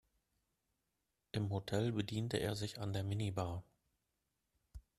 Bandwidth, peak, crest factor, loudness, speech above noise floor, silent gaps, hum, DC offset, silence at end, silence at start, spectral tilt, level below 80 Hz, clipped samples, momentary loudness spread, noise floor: 14 kHz; -20 dBFS; 22 dB; -41 LUFS; 48 dB; none; none; under 0.1%; 0.2 s; 1.35 s; -6 dB/octave; -64 dBFS; under 0.1%; 6 LU; -87 dBFS